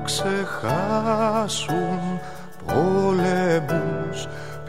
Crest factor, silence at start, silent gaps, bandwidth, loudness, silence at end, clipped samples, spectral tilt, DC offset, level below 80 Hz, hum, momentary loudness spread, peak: 16 dB; 0 s; none; 16 kHz; -23 LUFS; 0 s; under 0.1%; -5 dB/octave; 1%; -48 dBFS; none; 11 LU; -8 dBFS